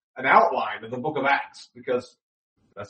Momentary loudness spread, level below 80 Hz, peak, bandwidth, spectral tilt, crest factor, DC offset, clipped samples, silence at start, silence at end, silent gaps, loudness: 13 LU; -72 dBFS; -4 dBFS; 8.4 kHz; -5 dB/octave; 22 dB; under 0.1%; under 0.1%; 0.15 s; 0.05 s; 2.22-2.56 s; -23 LUFS